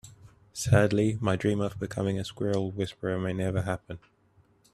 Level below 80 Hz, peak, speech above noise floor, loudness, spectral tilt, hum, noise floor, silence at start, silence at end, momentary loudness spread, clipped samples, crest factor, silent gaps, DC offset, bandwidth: -56 dBFS; -8 dBFS; 36 dB; -29 LUFS; -6.5 dB/octave; none; -64 dBFS; 0.05 s; 0.75 s; 12 LU; under 0.1%; 22 dB; none; under 0.1%; 13 kHz